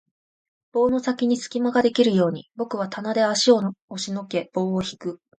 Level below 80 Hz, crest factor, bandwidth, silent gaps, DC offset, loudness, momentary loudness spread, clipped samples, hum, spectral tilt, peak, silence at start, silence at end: -62 dBFS; 18 dB; 9.4 kHz; 3.82-3.88 s; under 0.1%; -23 LUFS; 11 LU; under 0.1%; none; -5 dB/octave; -4 dBFS; 0.75 s; 0.25 s